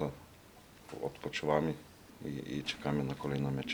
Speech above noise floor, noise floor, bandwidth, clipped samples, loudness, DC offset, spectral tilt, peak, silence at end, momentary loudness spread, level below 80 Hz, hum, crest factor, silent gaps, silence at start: 22 dB; -57 dBFS; over 20 kHz; under 0.1%; -37 LUFS; under 0.1%; -6 dB/octave; -14 dBFS; 0 s; 23 LU; -60 dBFS; none; 22 dB; none; 0 s